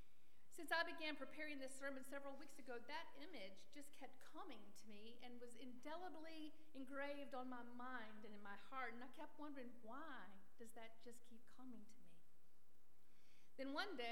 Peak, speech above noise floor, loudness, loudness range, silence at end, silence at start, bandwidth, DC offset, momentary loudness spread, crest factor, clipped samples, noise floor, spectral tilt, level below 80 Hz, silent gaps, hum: -30 dBFS; 26 dB; -54 LUFS; 11 LU; 0 s; 0 s; 19 kHz; 0.3%; 14 LU; 26 dB; under 0.1%; -81 dBFS; -3.5 dB/octave; -90 dBFS; none; none